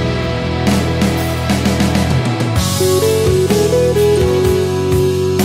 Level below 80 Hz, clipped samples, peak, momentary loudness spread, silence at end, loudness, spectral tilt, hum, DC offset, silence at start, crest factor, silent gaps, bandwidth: -28 dBFS; under 0.1%; 0 dBFS; 4 LU; 0 s; -14 LUFS; -5.5 dB/octave; none; under 0.1%; 0 s; 12 dB; none; 16.5 kHz